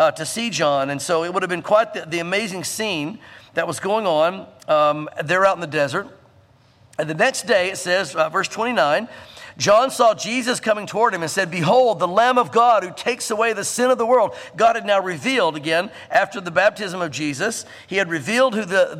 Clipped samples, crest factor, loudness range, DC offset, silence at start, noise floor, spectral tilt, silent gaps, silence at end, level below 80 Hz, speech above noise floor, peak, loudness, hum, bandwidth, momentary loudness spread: under 0.1%; 16 dB; 4 LU; under 0.1%; 0 s; -53 dBFS; -3.5 dB/octave; none; 0 s; -64 dBFS; 34 dB; -2 dBFS; -19 LUFS; none; 15.5 kHz; 9 LU